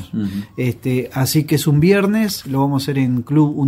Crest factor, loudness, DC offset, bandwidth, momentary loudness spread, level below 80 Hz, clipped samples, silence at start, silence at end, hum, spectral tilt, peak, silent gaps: 16 dB; -17 LUFS; under 0.1%; 16 kHz; 9 LU; -48 dBFS; under 0.1%; 0 s; 0 s; none; -6 dB/octave; -2 dBFS; none